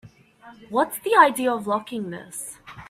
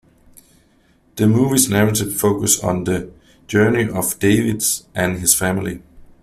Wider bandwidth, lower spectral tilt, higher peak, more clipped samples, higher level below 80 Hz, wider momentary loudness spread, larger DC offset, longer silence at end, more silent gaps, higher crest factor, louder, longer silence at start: about the same, 16 kHz vs 16 kHz; about the same, -3.5 dB/octave vs -4 dB/octave; about the same, -2 dBFS vs 0 dBFS; neither; second, -64 dBFS vs -46 dBFS; first, 17 LU vs 10 LU; neither; second, 0.05 s vs 0.2 s; neither; about the same, 22 dB vs 18 dB; second, -22 LUFS vs -17 LUFS; second, 0.05 s vs 1.15 s